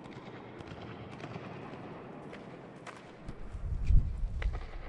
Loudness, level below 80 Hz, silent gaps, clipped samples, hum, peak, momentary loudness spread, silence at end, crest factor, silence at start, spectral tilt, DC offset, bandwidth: -40 LUFS; -36 dBFS; none; under 0.1%; none; -12 dBFS; 16 LU; 0 s; 24 dB; 0 s; -7.5 dB/octave; under 0.1%; 8.4 kHz